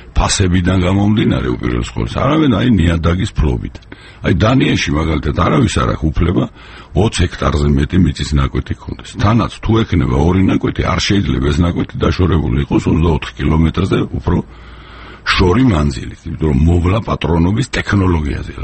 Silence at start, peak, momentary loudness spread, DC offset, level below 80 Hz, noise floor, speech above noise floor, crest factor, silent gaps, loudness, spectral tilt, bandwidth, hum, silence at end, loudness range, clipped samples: 0 s; 0 dBFS; 7 LU; under 0.1%; -24 dBFS; -34 dBFS; 20 dB; 14 dB; none; -14 LUFS; -6 dB/octave; 8.8 kHz; none; 0 s; 2 LU; under 0.1%